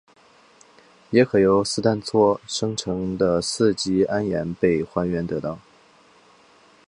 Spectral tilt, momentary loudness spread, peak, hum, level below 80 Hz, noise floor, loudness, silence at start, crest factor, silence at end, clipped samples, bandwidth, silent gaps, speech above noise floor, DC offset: -5.5 dB/octave; 8 LU; -4 dBFS; none; -52 dBFS; -54 dBFS; -22 LUFS; 1.1 s; 20 dB; 1.3 s; under 0.1%; 11 kHz; none; 33 dB; under 0.1%